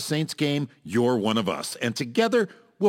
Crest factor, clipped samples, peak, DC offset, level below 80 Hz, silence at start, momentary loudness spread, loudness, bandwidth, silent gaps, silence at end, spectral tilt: 16 dB; under 0.1%; -8 dBFS; under 0.1%; -70 dBFS; 0 s; 6 LU; -25 LUFS; 17 kHz; none; 0 s; -5 dB/octave